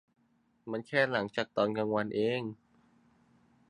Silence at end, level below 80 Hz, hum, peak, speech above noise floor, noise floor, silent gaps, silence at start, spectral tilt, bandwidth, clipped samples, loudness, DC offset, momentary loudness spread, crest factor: 1.15 s; -74 dBFS; none; -12 dBFS; 40 dB; -72 dBFS; none; 0.65 s; -6.5 dB/octave; 10.5 kHz; under 0.1%; -32 LUFS; under 0.1%; 11 LU; 22 dB